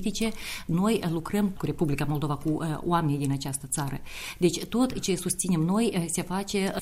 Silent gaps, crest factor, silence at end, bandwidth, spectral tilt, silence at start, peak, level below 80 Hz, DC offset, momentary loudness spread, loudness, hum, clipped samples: none; 16 dB; 0 s; 16 kHz; -5 dB/octave; 0 s; -10 dBFS; -46 dBFS; under 0.1%; 5 LU; -28 LUFS; none; under 0.1%